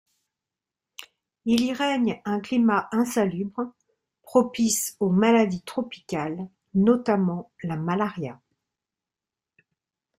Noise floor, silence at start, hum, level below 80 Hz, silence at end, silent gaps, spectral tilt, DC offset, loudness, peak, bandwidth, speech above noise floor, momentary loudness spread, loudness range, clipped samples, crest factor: -90 dBFS; 1 s; none; -64 dBFS; 1.85 s; none; -5 dB/octave; under 0.1%; -24 LUFS; -6 dBFS; 15.5 kHz; 66 dB; 13 LU; 4 LU; under 0.1%; 20 dB